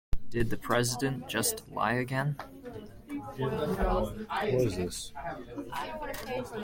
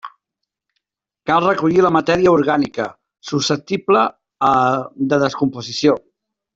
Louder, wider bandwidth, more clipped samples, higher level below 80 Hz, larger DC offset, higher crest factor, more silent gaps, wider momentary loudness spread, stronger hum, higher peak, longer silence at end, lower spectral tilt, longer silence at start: second, -32 LUFS vs -17 LUFS; first, 16.5 kHz vs 7.8 kHz; neither; first, -44 dBFS vs -54 dBFS; neither; about the same, 20 dB vs 16 dB; neither; about the same, 12 LU vs 10 LU; neither; second, -12 dBFS vs -2 dBFS; second, 0 s vs 0.55 s; about the same, -4.5 dB/octave vs -5.5 dB/octave; about the same, 0.1 s vs 0.05 s